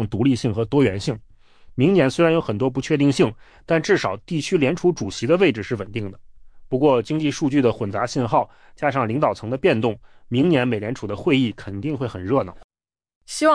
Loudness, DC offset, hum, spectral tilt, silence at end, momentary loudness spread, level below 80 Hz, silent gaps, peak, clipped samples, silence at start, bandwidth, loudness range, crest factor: -21 LUFS; under 0.1%; none; -6.5 dB/octave; 0 s; 10 LU; -50 dBFS; 12.64-12.69 s, 13.16-13.21 s; -6 dBFS; under 0.1%; 0 s; 10.5 kHz; 2 LU; 16 dB